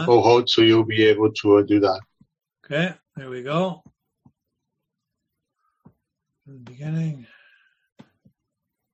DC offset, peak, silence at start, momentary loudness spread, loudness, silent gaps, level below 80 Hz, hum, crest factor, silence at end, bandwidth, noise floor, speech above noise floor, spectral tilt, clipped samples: under 0.1%; -2 dBFS; 0 s; 20 LU; -19 LUFS; none; -60 dBFS; none; 20 dB; 1.7 s; 7.8 kHz; -81 dBFS; 62 dB; -6.5 dB/octave; under 0.1%